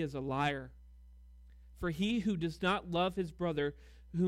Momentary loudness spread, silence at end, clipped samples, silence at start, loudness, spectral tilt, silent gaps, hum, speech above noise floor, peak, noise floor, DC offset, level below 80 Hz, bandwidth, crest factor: 8 LU; 0 s; under 0.1%; 0 s; -35 LUFS; -6.5 dB/octave; none; none; 21 dB; -18 dBFS; -56 dBFS; under 0.1%; -54 dBFS; 14.5 kHz; 18 dB